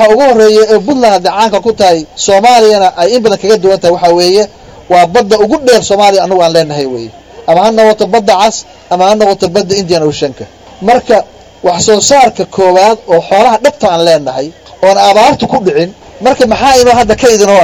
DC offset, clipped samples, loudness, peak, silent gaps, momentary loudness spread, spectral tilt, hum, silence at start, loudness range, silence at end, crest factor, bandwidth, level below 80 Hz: under 0.1%; 3%; -7 LUFS; 0 dBFS; none; 10 LU; -3.5 dB/octave; none; 0 s; 2 LU; 0 s; 8 dB; 17 kHz; -38 dBFS